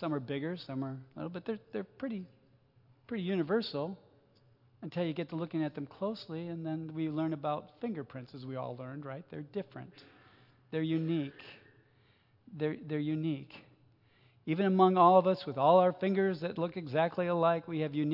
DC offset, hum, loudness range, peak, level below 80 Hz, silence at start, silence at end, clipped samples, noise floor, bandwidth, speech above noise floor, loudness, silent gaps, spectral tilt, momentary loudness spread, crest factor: under 0.1%; none; 12 LU; -12 dBFS; -80 dBFS; 0 s; 0 s; under 0.1%; -67 dBFS; 5.8 kHz; 35 dB; -33 LUFS; none; -9.5 dB/octave; 18 LU; 22 dB